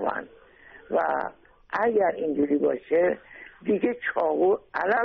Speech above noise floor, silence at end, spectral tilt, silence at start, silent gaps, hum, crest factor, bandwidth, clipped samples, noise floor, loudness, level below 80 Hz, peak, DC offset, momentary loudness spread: 26 dB; 0 s; -4.5 dB/octave; 0 s; none; none; 14 dB; 6 kHz; under 0.1%; -51 dBFS; -26 LUFS; -62 dBFS; -12 dBFS; under 0.1%; 12 LU